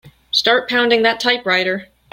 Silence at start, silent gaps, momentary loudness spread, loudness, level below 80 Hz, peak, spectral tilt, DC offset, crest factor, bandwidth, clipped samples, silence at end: 0.05 s; none; 6 LU; -15 LUFS; -60 dBFS; -2 dBFS; -3 dB/octave; under 0.1%; 16 dB; 16.5 kHz; under 0.1%; 0.3 s